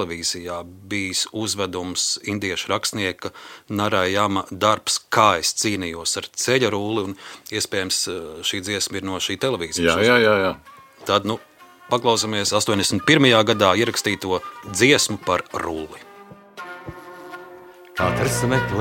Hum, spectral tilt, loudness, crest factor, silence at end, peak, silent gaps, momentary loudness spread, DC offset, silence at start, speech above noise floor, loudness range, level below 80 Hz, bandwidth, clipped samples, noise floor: none; -3 dB/octave; -20 LUFS; 20 dB; 0 s; 0 dBFS; none; 18 LU; under 0.1%; 0 s; 23 dB; 6 LU; -52 dBFS; 17 kHz; under 0.1%; -44 dBFS